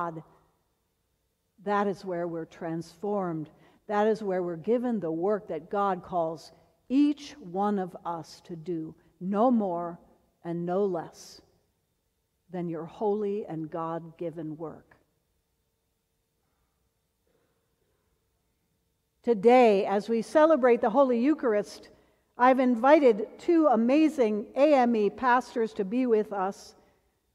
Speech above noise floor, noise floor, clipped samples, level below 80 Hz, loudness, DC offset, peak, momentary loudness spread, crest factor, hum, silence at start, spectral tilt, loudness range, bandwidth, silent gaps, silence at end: 51 dB; -77 dBFS; under 0.1%; -70 dBFS; -27 LUFS; under 0.1%; -6 dBFS; 16 LU; 20 dB; none; 0 s; -7 dB/octave; 12 LU; 12.5 kHz; none; 0.65 s